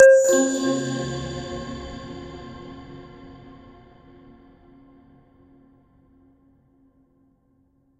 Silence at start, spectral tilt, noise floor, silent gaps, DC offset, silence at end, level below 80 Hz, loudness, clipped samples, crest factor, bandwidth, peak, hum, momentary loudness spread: 0 s; -4 dB/octave; -63 dBFS; none; under 0.1%; 4.7 s; -50 dBFS; -22 LUFS; under 0.1%; 24 dB; 15.5 kHz; 0 dBFS; none; 26 LU